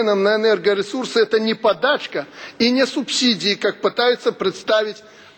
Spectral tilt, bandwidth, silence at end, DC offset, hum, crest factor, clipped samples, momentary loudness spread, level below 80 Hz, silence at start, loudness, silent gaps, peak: -3.5 dB/octave; 17 kHz; 0.4 s; under 0.1%; none; 14 dB; under 0.1%; 7 LU; -68 dBFS; 0 s; -18 LUFS; none; -4 dBFS